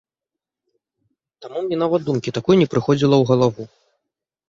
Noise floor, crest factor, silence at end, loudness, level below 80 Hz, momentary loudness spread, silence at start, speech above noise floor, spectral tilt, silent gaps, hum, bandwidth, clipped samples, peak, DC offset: -87 dBFS; 18 dB; 0.85 s; -18 LUFS; -58 dBFS; 15 LU; 1.4 s; 69 dB; -7 dB/octave; none; none; 7.6 kHz; under 0.1%; -2 dBFS; under 0.1%